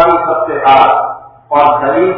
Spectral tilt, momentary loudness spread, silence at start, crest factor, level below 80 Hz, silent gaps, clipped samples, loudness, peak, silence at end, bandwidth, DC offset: -7.5 dB/octave; 10 LU; 0 s; 10 dB; -46 dBFS; none; 0.4%; -10 LUFS; 0 dBFS; 0 s; 5.4 kHz; under 0.1%